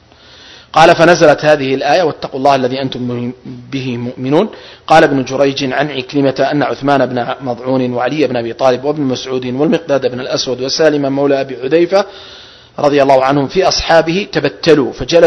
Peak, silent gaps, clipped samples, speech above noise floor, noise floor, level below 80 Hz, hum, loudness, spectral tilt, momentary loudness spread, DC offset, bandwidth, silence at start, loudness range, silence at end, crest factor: 0 dBFS; none; 0.9%; 28 dB; -40 dBFS; -42 dBFS; none; -12 LUFS; -5 dB/octave; 11 LU; under 0.1%; 11 kHz; 0.45 s; 4 LU; 0 s; 12 dB